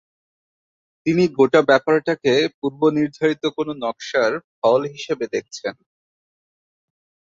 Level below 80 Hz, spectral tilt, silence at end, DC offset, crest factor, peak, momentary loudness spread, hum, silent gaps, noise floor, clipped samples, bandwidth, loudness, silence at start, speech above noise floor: -64 dBFS; -5.5 dB/octave; 1.55 s; under 0.1%; 18 dB; -2 dBFS; 11 LU; none; 2.54-2.62 s, 4.44-4.62 s; under -90 dBFS; under 0.1%; 7.6 kHz; -20 LUFS; 1.05 s; over 71 dB